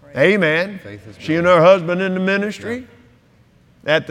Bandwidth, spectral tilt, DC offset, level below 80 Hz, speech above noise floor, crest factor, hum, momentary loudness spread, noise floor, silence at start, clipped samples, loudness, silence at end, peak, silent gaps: 10.5 kHz; -6.5 dB/octave; under 0.1%; -56 dBFS; 36 dB; 18 dB; none; 19 LU; -52 dBFS; 0.15 s; under 0.1%; -16 LUFS; 0 s; 0 dBFS; none